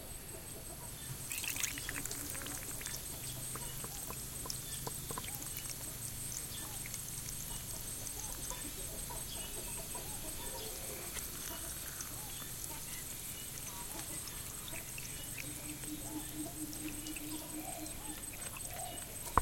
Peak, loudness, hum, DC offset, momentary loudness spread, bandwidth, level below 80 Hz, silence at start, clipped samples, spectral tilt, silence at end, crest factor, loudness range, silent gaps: -12 dBFS; -41 LUFS; none; under 0.1%; 3 LU; 17 kHz; -54 dBFS; 0 s; under 0.1%; -2 dB/octave; 0 s; 32 dB; 2 LU; none